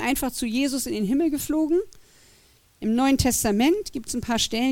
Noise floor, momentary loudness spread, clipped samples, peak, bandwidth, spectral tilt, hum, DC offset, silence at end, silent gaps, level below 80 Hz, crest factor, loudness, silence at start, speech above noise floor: -57 dBFS; 7 LU; under 0.1%; -6 dBFS; 17.5 kHz; -4 dB/octave; none; under 0.1%; 0 s; none; -44 dBFS; 18 dB; -23 LUFS; 0 s; 34 dB